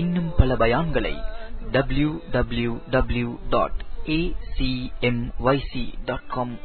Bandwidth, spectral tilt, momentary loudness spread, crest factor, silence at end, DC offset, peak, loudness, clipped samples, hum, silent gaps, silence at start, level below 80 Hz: 4.5 kHz; -11.5 dB/octave; 10 LU; 20 dB; 0 s; under 0.1%; -2 dBFS; -25 LUFS; under 0.1%; none; none; 0 s; -30 dBFS